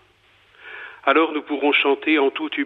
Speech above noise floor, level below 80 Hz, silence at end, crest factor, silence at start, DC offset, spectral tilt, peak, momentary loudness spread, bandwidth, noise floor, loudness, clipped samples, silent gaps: 37 dB; -72 dBFS; 0 s; 18 dB; 0.65 s; under 0.1%; -5 dB/octave; -4 dBFS; 19 LU; 4.5 kHz; -57 dBFS; -19 LUFS; under 0.1%; none